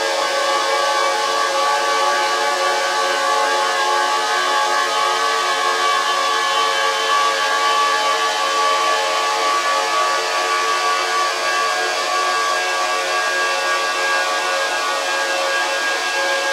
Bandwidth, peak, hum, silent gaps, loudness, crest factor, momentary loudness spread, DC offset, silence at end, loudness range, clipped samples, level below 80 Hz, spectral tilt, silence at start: 16 kHz; -6 dBFS; none; none; -17 LUFS; 12 dB; 2 LU; under 0.1%; 0 s; 1 LU; under 0.1%; -80 dBFS; 1 dB/octave; 0 s